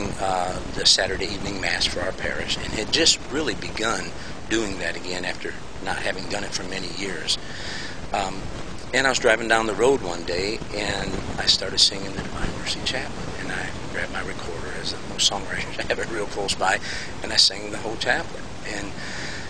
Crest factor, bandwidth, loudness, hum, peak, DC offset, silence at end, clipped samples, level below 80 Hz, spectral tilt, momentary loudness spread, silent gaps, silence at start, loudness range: 24 dB; 15 kHz; -24 LUFS; none; -2 dBFS; 2%; 0 s; under 0.1%; -42 dBFS; -2.5 dB/octave; 13 LU; none; 0 s; 7 LU